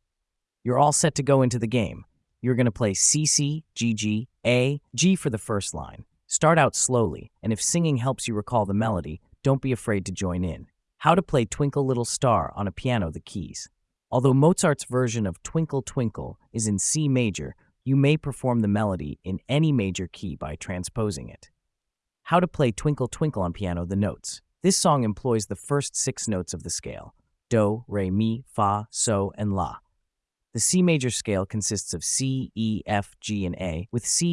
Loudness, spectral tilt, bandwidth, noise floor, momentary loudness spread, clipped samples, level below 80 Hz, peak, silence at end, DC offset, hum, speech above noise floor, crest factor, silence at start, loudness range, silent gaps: -24 LUFS; -5 dB/octave; 12 kHz; -85 dBFS; 12 LU; under 0.1%; -52 dBFS; -6 dBFS; 0 s; under 0.1%; none; 60 dB; 20 dB; 0.65 s; 4 LU; none